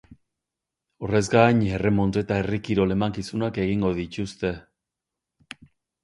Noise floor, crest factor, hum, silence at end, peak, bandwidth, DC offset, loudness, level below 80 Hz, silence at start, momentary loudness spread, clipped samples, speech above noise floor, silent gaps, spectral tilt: -86 dBFS; 22 dB; none; 1.45 s; -4 dBFS; 11.5 kHz; under 0.1%; -24 LUFS; -46 dBFS; 0.1 s; 20 LU; under 0.1%; 63 dB; none; -6.5 dB/octave